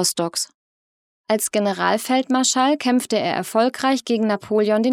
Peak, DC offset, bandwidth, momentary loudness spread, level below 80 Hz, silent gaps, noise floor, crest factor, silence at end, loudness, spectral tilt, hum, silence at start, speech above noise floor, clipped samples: -4 dBFS; under 0.1%; 17 kHz; 5 LU; -72 dBFS; 0.54-1.24 s; under -90 dBFS; 16 dB; 0 s; -20 LUFS; -3 dB/octave; none; 0 s; over 71 dB; under 0.1%